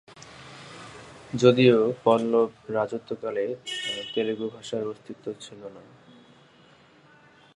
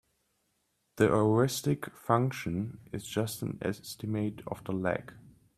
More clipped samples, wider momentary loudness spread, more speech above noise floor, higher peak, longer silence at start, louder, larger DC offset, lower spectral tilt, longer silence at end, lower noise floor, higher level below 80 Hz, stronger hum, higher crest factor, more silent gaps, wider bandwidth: neither; first, 24 LU vs 12 LU; second, 31 dB vs 46 dB; first, -4 dBFS vs -12 dBFS; second, 0.25 s vs 0.95 s; first, -25 LUFS vs -31 LUFS; neither; about the same, -6 dB/octave vs -6 dB/octave; first, 1.75 s vs 0.25 s; second, -56 dBFS vs -77 dBFS; second, -68 dBFS vs -62 dBFS; neither; about the same, 22 dB vs 20 dB; neither; second, 11.5 kHz vs 15 kHz